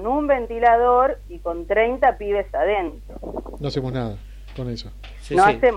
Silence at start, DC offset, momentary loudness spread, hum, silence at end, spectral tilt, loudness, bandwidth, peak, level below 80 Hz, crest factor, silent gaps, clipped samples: 0 s; under 0.1%; 17 LU; none; 0 s; -6.5 dB/octave; -21 LUFS; 11.5 kHz; -4 dBFS; -38 dBFS; 16 dB; none; under 0.1%